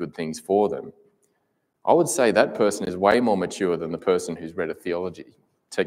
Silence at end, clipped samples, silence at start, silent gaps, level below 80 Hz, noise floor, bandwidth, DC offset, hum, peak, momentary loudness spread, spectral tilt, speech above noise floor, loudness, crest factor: 0 s; under 0.1%; 0 s; none; -62 dBFS; -73 dBFS; 16 kHz; under 0.1%; none; -2 dBFS; 13 LU; -4.5 dB/octave; 50 dB; -23 LUFS; 20 dB